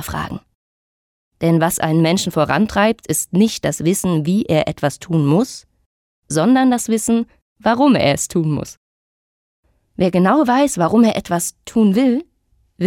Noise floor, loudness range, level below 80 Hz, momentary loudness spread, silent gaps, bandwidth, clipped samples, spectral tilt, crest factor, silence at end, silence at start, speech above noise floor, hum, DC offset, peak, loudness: -61 dBFS; 2 LU; -48 dBFS; 9 LU; 0.55-1.31 s, 5.86-6.22 s, 7.42-7.56 s, 8.77-9.63 s; 18 kHz; under 0.1%; -5.5 dB/octave; 14 dB; 0 s; 0 s; 45 dB; none; under 0.1%; -4 dBFS; -16 LUFS